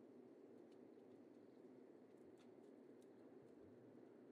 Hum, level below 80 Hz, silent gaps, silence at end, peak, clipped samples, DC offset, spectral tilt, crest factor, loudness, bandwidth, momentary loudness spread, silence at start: none; under -90 dBFS; none; 0 s; -52 dBFS; under 0.1%; under 0.1%; -7 dB/octave; 12 dB; -65 LUFS; 9.4 kHz; 1 LU; 0 s